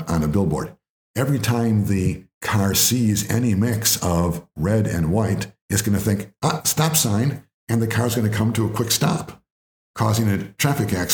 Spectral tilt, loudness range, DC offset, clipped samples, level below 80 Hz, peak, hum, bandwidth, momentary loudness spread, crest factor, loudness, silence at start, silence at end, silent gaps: -4.5 dB/octave; 2 LU; under 0.1%; under 0.1%; -46 dBFS; -2 dBFS; none; over 20 kHz; 8 LU; 18 dB; -21 LUFS; 0 s; 0 s; 0.89-1.14 s, 2.34-2.41 s, 5.61-5.69 s, 7.54-7.67 s, 9.50-9.94 s